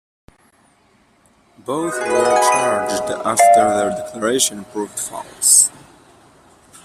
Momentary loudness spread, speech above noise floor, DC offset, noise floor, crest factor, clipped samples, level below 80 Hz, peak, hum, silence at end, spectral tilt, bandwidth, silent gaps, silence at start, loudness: 15 LU; 39 dB; under 0.1%; -56 dBFS; 18 dB; under 0.1%; -58 dBFS; 0 dBFS; none; 1.15 s; -1.5 dB/octave; 15 kHz; none; 1.7 s; -16 LUFS